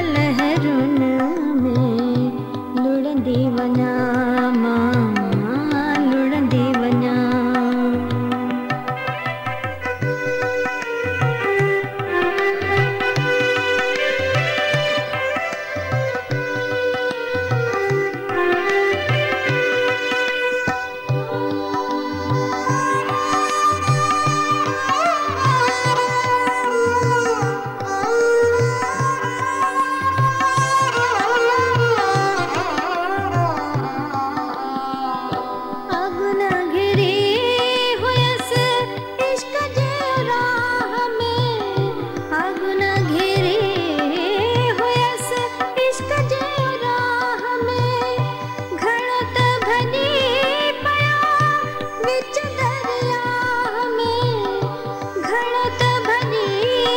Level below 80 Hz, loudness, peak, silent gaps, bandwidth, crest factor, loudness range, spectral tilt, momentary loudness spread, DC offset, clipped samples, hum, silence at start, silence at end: -54 dBFS; -19 LUFS; -4 dBFS; none; 16.5 kHz; 14 dB; 3 LU; -5.5 dB/octave; 6 LU; under 0.1%; under 0.1%; none; 0 s; 0 s